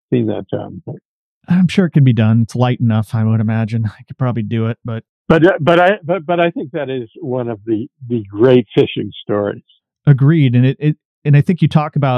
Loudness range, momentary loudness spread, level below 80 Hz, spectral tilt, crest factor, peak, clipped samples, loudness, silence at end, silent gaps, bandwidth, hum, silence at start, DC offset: 2 LU; 13 LU; -52 dBFS; -8.5 dB/octave; 14 dB; 0 dBFS; under 0.1%; -15 LUFS; 0 s; 1.05-1.41 s, 5.09-5.25 s, 11.05-11.22 s; 9.2 kHz; none; 0.1 s; under 0.1%